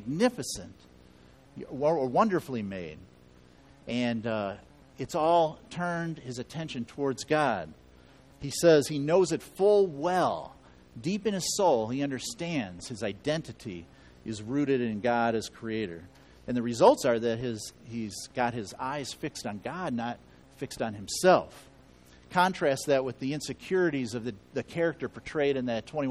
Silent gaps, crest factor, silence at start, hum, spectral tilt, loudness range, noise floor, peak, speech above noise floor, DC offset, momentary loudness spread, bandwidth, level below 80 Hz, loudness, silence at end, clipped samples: none; 24 dB; 0 s; none; -5 dB/octave; 6 LU; -56 dBFS; -6 dBFS; 27 dB; under 0.1%; 16 LU; 14.5 kHz; -60 dBFS; -29 LUFS; 0 s; under 0.1%